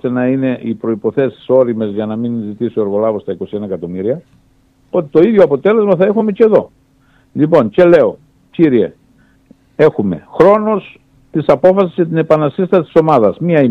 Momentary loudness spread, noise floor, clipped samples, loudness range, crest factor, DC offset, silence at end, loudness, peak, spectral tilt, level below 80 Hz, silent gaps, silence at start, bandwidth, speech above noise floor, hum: 11 LU; -51 dBFS; under 0.1%; 5 LU; 12 dB; under 0.1%; 0 s; -13 LUFS; 0 dBFS; -9.5 dB/octave; -52 dBFS; none; 0.05 s; 6.8 kHz; 39 dB; none